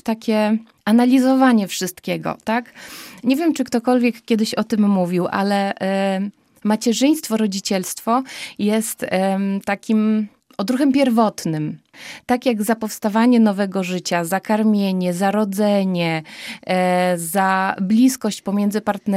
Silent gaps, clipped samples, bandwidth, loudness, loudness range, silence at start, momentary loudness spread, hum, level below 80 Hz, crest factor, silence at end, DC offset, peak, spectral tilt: none; under 0.1%; 16 kHz; -19 LUFS; 2 LU; 0.05 s; 9 LU; none; -64 dBFS; 16 dB; 0 s; under 0.1%; -2 dBFS; -5.5 dB/octave